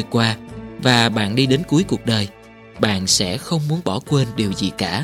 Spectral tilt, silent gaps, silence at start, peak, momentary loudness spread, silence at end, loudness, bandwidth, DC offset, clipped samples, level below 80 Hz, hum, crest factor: -4.5 dB/octave; none; 0 s; 0 dBFS; 7 LU; 0 s; -19 LUFS; 16 kHz; under 0.1%; under 0.1%; -48 dBFS; none; 20 dB